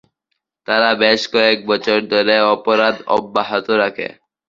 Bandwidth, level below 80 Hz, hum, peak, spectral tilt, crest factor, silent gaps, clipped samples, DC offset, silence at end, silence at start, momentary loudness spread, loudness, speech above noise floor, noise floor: 7.6 kHz; -60 dBFS; none; 0 dBFS; -4 dB/octave; 16 dB; none; under 0.1%; under 0.1%; 0.4 s; 0.7 s; 6 LU; -15 LUFS; 59 dB; -74 dBFS